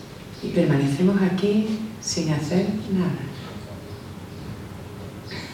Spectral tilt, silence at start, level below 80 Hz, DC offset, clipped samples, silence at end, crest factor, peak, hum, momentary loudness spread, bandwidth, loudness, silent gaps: -6 dB/octave; 0 s; -52 dBFS; under 0.1%; under 0.1%; 0 s; 16 dB; -8 dBFS; none; 17 LU; 15.5 kHz; -23 LUFS; none